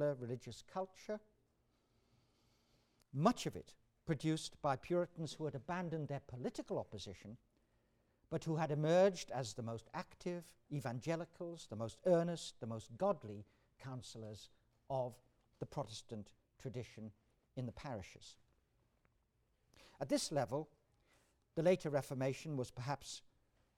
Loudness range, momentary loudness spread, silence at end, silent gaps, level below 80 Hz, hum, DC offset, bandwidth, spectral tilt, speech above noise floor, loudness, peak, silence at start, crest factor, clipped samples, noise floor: 10 LU; 17 LU; 0.6 s; none; -72 dBFS; none; under 0.1%; 16 kHz; -6 dB/octave; 39 dB; -42 LUFS; -20 dBFS; 0 s; 24 dB; under 0.1%; -80 dBFS